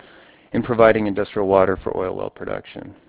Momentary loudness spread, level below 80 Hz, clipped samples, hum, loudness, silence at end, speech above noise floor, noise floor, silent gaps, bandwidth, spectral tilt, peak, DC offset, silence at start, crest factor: 15 LU; -46 dBFS; under 0.1%; none; -20 LUFS; 0.15 s; 29 dB; -48 dBFS; none; 4 kHz; -10.5 dB/octave; 0 dBFS; under 0.1%; 0.55 s; 20 dB